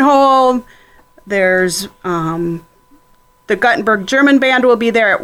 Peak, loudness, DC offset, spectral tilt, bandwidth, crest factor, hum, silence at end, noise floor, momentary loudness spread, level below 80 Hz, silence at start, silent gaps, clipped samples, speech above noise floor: -2 dBFS; -13 LUFS; under 0.1%; -4.5 dB/octave; 16 kHz; 12 dB; none; 0 s; -51 dBFS; 11 LU; -50 dBFS; 0 s; none; under 0.1%; 37 dB